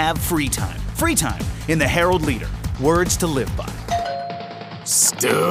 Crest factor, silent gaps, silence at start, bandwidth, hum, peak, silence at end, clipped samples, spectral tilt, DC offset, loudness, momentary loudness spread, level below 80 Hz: 18 dB; none; 0 s; 16 kHz; none; -4 dBFS; 0 s; under 0.1%; -3.5 dB/octave; under 0.1%; -20 LUFS; 13 LU; -32 dBFS